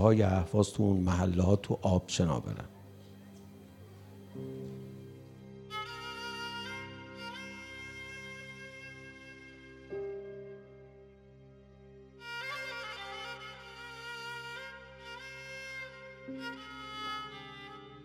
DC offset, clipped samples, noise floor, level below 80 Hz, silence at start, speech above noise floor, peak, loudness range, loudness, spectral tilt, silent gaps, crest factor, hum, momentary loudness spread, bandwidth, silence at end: under 0.1%; under 0.1%; -56 dBFS; -58 dBFS; 0 s; 28 dB; -8 dBFS; 15 LU; -36 LUFS; -6 dB/octave; none; 26 dB; none; 24 LU; 14 kHz; 0 s